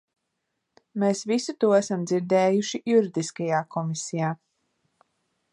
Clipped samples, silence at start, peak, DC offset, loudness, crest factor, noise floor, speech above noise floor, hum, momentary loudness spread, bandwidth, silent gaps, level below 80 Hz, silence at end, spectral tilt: under 0.1%; 0.95 s; -8 dBFS; under 0.1%; -25 LUFS; 18 dB; -79 dBFS; 55 dB; none; 8 LU; 11.5 kHz; none; -76 dBFS; 1.15 s; -5.5 dB/octave